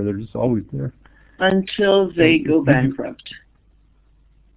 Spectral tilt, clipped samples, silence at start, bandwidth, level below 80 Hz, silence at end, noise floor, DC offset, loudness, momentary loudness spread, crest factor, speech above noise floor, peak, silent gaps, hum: -10.5 dB/octave; under 0.1%; 0 s; 4 kHz; -48 dBFS; 1.2 s; -55 dBFS; under 0.1%; -18 LUFS; 16 LU; 20 dB; 37 dB; 0 dBFS; none; none